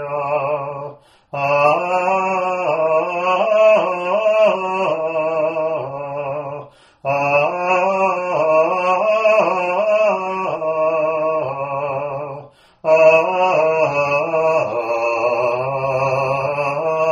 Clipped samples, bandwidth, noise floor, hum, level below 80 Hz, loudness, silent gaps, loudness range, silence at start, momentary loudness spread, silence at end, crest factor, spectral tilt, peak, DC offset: under 0.1%; 7.6 kHz; -38 dBFS; none; -62 dBFS; -17 LUFS; none; 4 LU; 0 s; 10 LU; 0 s; 16 dB; -5.5 dB/octave; -2 dBFS; under 0.1%